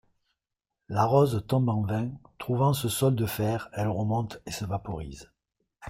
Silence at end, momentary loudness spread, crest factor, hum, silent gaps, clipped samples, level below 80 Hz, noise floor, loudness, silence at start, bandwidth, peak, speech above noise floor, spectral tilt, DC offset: 0 s; 13 LU; 18 dB; none; none; under 0.1%; -54 dBFS; -87 dBFS; -28 LUFS; 0.9 s; 16 kHz; -10 dBFS; 60 dB; -6.5 dB/octave; under 0.1%